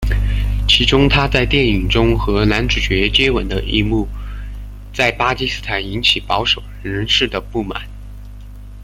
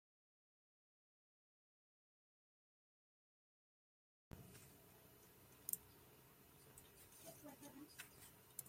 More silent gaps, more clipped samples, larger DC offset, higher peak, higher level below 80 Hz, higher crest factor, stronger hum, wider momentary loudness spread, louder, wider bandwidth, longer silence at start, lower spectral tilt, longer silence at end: neither; neither; neither; first, 0 dBFS vs -22 dBFS; first, -24 dBFS vs -82 dBFS; second, 16 dB vs 40 dB; first, 50 Hz at -25 dBFS vs none; about the same, 17 LU vs 18 LU; first, -16 LUFS vs -57 LUFS; second, 14 kHz vs 16.5 kHz; second, 0 s vs 4.3 s; first, -5 dB/octave vs -2.5 dB/octave; about the same, 0 s vs 0 s